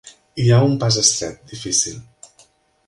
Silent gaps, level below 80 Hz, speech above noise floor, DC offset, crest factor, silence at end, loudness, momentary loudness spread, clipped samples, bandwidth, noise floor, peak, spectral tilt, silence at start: none; -52 dBFS; 37 dB; under 0.1%; 20 dB; 0.85 s; -17 LUFS; 18 LU; under 0.1%; 11.5 kHz; -55 dBFS; 0 dBFS; -4 dB/octave; 0.05 s